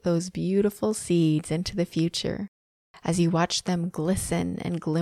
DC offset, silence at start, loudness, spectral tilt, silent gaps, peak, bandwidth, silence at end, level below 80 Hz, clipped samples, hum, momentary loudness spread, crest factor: under 0.1%; 0.05 s; -26 LUFS; -5.5 dB/octave; 2.48-2.94 s; -10 dBFS; 14.5 kHz; 0 s; -50 dBFS; under 0.1%; none; 7 LU; 14 dB